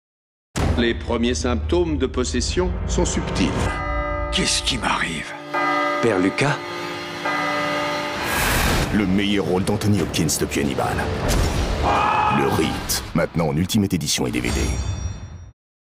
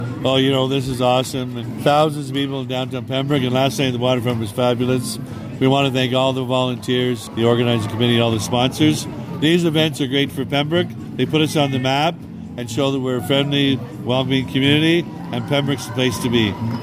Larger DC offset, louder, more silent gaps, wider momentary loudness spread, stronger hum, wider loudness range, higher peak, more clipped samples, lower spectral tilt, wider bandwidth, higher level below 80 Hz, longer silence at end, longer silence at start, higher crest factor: neither; about the same, -21 LUFS vs -19 LUFS; neither; about the same, 6 LU vs 8 LU; neither; about the same, 2 LU vs 2 LU; second, -8 dBFS vs -2 dBFS; neither; about the same, -4.5 dB/octave vs -5.5 dB/octave; about the same, 16 kHz vs 16 kHz; first, -30 dBFS vs -52 dBFS; first, 0.45 s vs 0 s; first, 0.55 s vs 0 s; about the same, 12 dB vs 16 dB